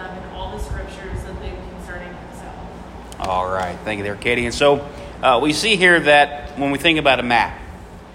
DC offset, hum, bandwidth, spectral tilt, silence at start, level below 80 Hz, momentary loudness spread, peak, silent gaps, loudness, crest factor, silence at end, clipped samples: under 0.1%; none; 16 kHz; -4 dB/octave; 0 s; -38 dBFS; 22 LU; 0 dBFS; none; -17 LUFS; 20 dB; 0 s; under 0.1%